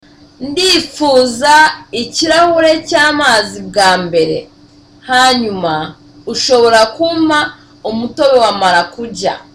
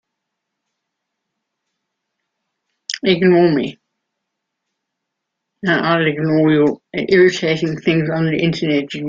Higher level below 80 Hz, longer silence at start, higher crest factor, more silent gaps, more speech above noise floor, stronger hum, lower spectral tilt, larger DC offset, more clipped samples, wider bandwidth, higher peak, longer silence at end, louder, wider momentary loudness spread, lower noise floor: first, -46 dBFS vs -58 dBFS; second, 0.4 s vs 2.9 s; second, 12 dB vs 18 dB; neither; second, 31 dB vs 63 dB; neither; second, -2.5 dB/octave vs -6.5 dB/octave; neither; neither; first, 16 kHz vs 7.6 kHz; about the same, 0 dBFS vs -2 dBFS; first, 0.15 s vs 0 s; first, -11 LUFS vs -16 LUFS; about the same, 12 LU vs 10 LU; second, -42 dBFS vs -78 dBFS